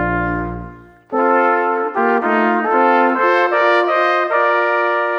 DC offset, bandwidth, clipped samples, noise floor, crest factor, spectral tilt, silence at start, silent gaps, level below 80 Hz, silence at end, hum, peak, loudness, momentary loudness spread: under 0.1%; 7.4 kHz; under 0.1%; -36 dBFS; 14 dB; -7 dB/octave; 0 s; none; -40 dBFS; 0 s; none; 0 dBFS; -15 LUFS; 7 LU